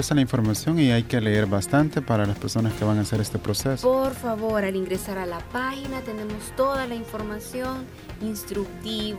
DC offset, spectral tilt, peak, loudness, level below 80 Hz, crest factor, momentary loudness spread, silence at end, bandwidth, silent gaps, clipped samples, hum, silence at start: under 0.1%; -5.5 dB/octave; -8 dBFS; -25 LUFS; -44 dBFS; 16 dB; 10 LU; 0 s; 16.5 kHz; none; under 0.1%; none; 0 s